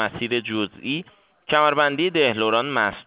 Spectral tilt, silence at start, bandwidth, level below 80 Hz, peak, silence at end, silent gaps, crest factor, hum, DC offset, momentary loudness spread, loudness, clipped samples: -8.5 dB/octave; 0 s; 4 kHz; -60 dBFS; -4 dBFS; 0.05 s; none; 18 dB; none; under 0.1%; 9 LU; -21 LUFS; under 0.1%